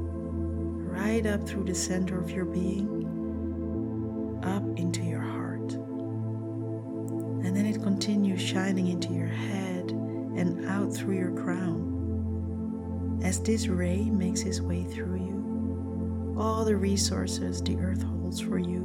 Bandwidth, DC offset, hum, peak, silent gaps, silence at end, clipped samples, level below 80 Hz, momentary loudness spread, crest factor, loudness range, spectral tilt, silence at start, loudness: 16 kHz; under 0.1%; none; -12 dBFS; none; 0 s; under 0.1%; -46 dBFS; 6 LU; 16 dB; 3 LU; -6 dB/octave; 0 s; -30 LUFS